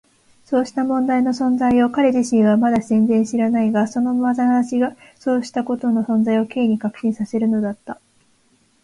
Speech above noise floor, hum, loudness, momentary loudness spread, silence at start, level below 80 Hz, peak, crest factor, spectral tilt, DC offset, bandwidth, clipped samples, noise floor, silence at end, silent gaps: 42 dB; none; -18 LUFS; 7 LU; 0.5 s; -58 dBFS; -6 dBFS; 12 dB; -6.5 dB/octave; under 0.1%; 11 kHz; under 0.1%; -59 dBFS; 0.9 s; none